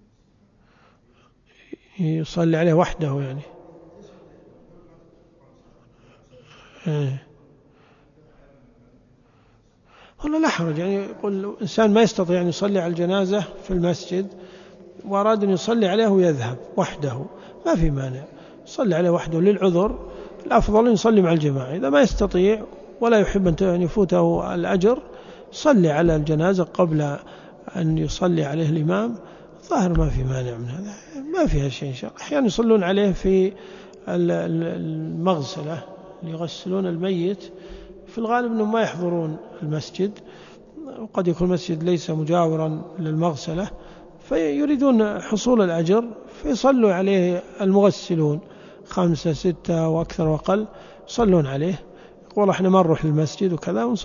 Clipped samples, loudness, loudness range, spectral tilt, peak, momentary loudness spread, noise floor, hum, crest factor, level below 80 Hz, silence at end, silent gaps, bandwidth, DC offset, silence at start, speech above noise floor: under 0.1%; -21 LUFS; 7 LU; -7 dB/octave; -4 dBFS; 15 LU; -58 dBFS; none; 18 dB; -40 dBFS; 0 s; none; 7.4 kHz; under 0.1%; 2 s; 38 dB